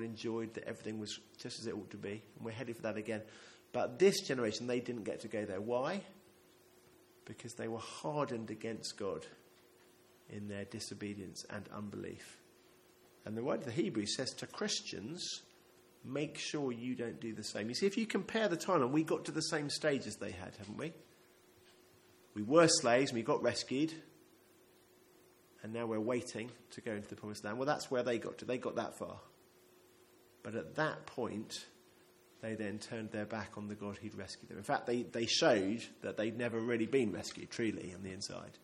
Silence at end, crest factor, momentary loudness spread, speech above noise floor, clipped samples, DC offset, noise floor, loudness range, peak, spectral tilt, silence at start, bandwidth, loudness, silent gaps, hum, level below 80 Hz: 0.05 s; 26 dB; 15 LU; 28 dB; under 0.1%; under 0.1%; -66 dBFS; 10 LU; -14 dBFS; -4 dB/octave; 0 s; 16.5 kHz; -38 LUFS; none; none; -78 dBFS